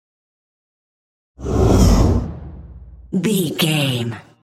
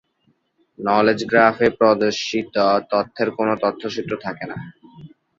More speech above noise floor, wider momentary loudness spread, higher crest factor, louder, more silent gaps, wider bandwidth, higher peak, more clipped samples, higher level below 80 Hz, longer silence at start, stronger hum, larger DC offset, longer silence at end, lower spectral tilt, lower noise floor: second, 19 dB vs 46 dB; first, 17 LU vs 13 LU; about the same, 16 dB vs 20 dB; about the same, -17 LUFS vs -19 LUFS; neither; first, 16 kHz vs 7.8 kHz; about the same, -2 dBFS vs -2 dBFS; neither; first, -26 dBFS vs -58 dBFS; first, 1.4 s vs 0.8 s; neither; neither; about the same, 0.2 s vs 0.3 s; about the same, -5.5 dB/octave vs -5 dB/octave; second, -38 dBFS vs -65 dBFS